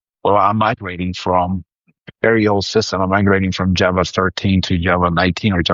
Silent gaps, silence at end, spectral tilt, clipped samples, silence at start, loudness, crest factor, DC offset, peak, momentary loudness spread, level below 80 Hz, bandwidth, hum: none; 0 s; -6 dB/octave; under 0.1%; 0.25 s; -16 LUFS; 14 dB; under 0.1%; -2 dBFS; 5 LU; -40 dBFS; 7.6 kHz; none